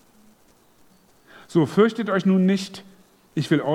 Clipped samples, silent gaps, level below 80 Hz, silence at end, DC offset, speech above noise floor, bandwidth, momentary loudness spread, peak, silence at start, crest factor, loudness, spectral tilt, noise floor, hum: under 0.1%; none; -70 dBFS; 0 s; under 0.1%; 37 dB; 12 kHz; 14 LU; -4 dBFS; 1.5 s; 20 dB; -21 LUFS; -7 dB/octave; -57 dBFS; none